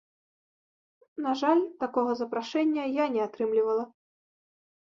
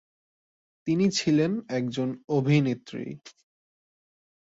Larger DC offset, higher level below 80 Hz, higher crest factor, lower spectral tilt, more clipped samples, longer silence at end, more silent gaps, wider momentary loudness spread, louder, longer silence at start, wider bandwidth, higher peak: neither; second, -78 dBFS vs -66 dBFS; about the same, 18 dB vs 18 dB; about the same, -5 dB/octave vs -6 dB/octave; neither; second, 0.95 s vs 1.1 s; second, none vs 2.24-2.28 s; second, 7 LU vs 14 LU; about the same, -28 LUFS vs -26 LUFS; first, 1.15 s vs 0.85 s; about the same, 7.4 kHz vs 7.8 kHz; about the same, -12 dBFS vs -10 dBFS